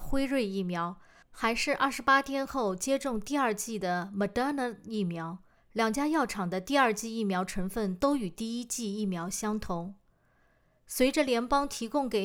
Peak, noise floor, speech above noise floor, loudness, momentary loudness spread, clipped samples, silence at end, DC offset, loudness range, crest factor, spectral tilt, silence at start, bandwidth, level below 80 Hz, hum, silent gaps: -12 dBFS; -67 dBFS; 37 dB; -30 LUFS; 9 LU; under 0.1%; 0 s; under 0.1%; 4 LU; 18 dB; -4.5 dB/octave; 0 s; over 20 kHz; -50 dBFS; none; none